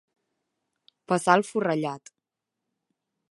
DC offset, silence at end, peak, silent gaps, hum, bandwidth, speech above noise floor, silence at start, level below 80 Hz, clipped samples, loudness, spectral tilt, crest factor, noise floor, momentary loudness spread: under 0.1%; 1.3 s; -4 dBFS; none; none; 11.5 kHz; 61 dB; 1.1 s; -78 dBFS; under 0.1%; -25 LUFS; -5 dB/octave; 24 dB; -86 dBFS; 12 LU